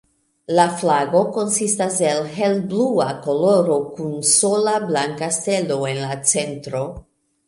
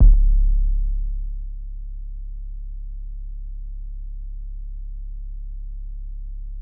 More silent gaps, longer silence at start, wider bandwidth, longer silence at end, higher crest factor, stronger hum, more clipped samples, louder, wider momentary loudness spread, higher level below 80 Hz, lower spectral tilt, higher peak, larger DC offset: neither; first, 0.5 s vs 0 s; first, 11.5 kHz vs 0.5 kHz; first, 0.5 s vs 0 s; about the same, 18 dB vs 16 dB; neither; neither; first, -19 LUFS vs -30 LUFS; second, 7 LU vs 15 LU; second, -56 dBFS vs -22 dBFS; second, -3.5 dB/octave vs -16.5 dB/octave; first, 0 dBFS vs -4 dBFS; neither